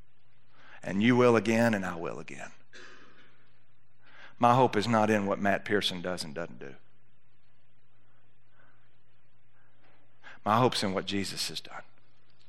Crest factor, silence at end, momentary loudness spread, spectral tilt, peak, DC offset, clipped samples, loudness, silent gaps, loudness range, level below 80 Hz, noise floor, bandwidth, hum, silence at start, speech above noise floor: 22 dB; 0.7 s; 23 LU; -5 dB/octave; -8 dBFS; 0.8%; under 0.1%; -28 LUFS; none; 9 LU; -74 dBFS; -70 dBFS; 14 kHz; none; 0.75 s; 42 dB